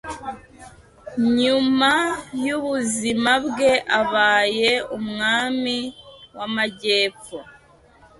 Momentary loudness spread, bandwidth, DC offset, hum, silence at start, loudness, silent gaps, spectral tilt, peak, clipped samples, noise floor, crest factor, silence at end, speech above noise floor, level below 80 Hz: 16 LU; 11.5 kHz; under 0.1%; none; 0.05 s; -20 LUFS; none; -3 dB/octave; -6 dBFS; under 0.1%; -52 dBFS; 16 dB; 0.7 s; 31 dB; -56 dBFS